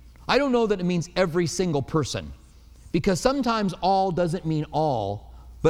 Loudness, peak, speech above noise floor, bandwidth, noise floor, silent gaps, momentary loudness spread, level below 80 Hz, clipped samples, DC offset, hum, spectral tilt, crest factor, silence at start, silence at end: -24 LUFS; -6 dBFS; 25 dB; 14.5 kHz; -48 dBFS; none; 7 LU; -46 dBFS; under 0.1%; under 0.1%; none; -5.5 dB/octave; 18 dB; 0.05 s; 0 s